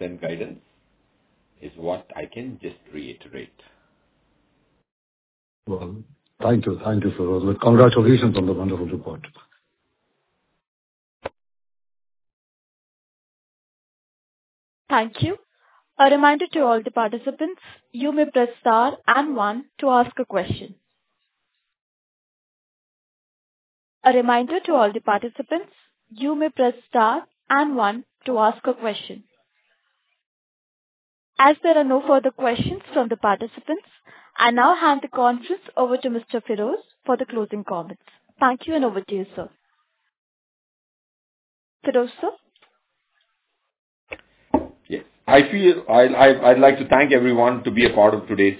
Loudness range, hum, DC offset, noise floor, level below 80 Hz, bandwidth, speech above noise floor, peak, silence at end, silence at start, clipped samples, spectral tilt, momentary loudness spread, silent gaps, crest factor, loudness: 15 LU; none; under 0.1%; -76 dBFS; -52 dBFS; 4 kHz; 57 dB; 0 dBFS; 0 s; 0 s; under 0.1%; -10 dB/octave; 20 LU; 4.92-5.63 s, 10.68-11.20 s, 12.33-14.85 s, 21.81-24.01 s, 30.26-31.33 s, 40.18-41.80 s, 43.79-44.07 s; 22 dB; -19 LUFS